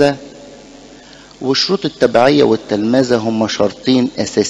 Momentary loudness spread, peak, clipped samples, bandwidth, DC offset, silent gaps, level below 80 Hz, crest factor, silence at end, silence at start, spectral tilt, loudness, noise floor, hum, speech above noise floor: 7 LU; 0 dBFS; under 0.1%; 10.5 kHz; under 0.1%; none; -50 dBFS; 14 dB; 0 s; 0 s; -5 dB/octave; -14 LUFS; -39 dBFS; none; 25 dB